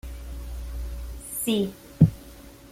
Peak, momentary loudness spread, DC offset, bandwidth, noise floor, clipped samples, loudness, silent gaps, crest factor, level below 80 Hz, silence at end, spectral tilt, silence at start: -4 dBFS; 21 LU; under 0.1%; 16.5 kHz; -46 dBFS; under 0.1%; -26 LUFS; none; 24 dB; -38 dBFS; 0 s; -6 dB/octave; 0.05 s